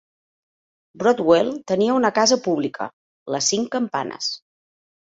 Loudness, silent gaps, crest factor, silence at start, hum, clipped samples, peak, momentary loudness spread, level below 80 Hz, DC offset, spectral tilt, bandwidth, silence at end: -20 LUFS; 2.93-3.26 s; 20 dB; 0.95 s; none; under 0.1%; -2 dBFS; 13 LU; -64 dBFS; under 0.1%; -3 dB/octave; 8 kHz; 0.7 s